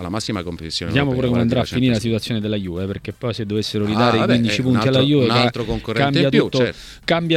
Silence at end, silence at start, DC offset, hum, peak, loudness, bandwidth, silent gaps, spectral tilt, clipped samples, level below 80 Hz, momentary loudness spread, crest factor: 0 s; 0 s; under 0.1%; none; -2 dBFS; -19 LUFS; 14.5 kHz; none; -6 dB/octave; under 0.1%; -42 dBFS; 10 LU; 16 dB